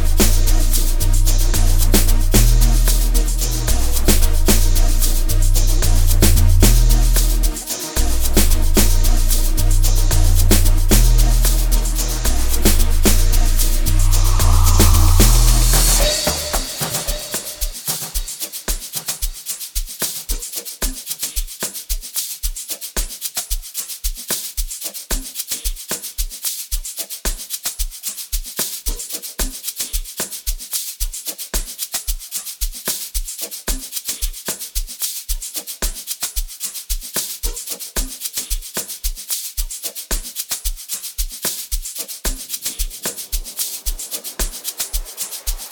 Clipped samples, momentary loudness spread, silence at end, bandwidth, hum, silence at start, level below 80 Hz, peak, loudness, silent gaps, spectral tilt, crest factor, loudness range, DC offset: under 0.1%; 10 LU; 0 s; 19.5 kHz; none; 0 s; -18 dBFS; 0 dBFS; -20 LUFS; none; -3.5 dB/octave; 16 dB; 8 LU; under 0.1%